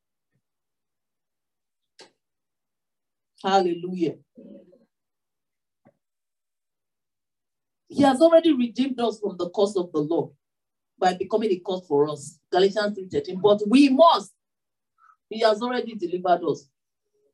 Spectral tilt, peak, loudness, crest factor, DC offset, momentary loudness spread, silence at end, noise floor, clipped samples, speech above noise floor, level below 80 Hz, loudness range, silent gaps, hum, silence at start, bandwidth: -5.5 dB/octave; -6 dBFS; -22 LUFS; 20 dB; under 0.1%; 13 LU; 0.75 s; under -90 dBFS; under 0.1%; over 68 dB; -76 dBFS; 9 LU; none; none; 2 s; 11.5 kHz